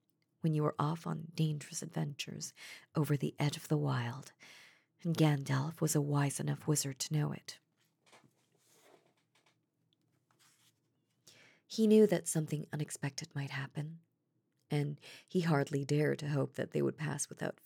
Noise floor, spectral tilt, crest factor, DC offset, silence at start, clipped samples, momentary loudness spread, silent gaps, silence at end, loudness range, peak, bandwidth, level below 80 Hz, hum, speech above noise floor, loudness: -81 dBFS; -5.5 dB/octave; 22 dB; under 0.1%; 0.45 s; under 0.1%; 12 LU; none; 0.15 s; 6 LU; -16 dBFS; 18 kHz; under -90 dBFS; none; 46 dB; -35 LUFS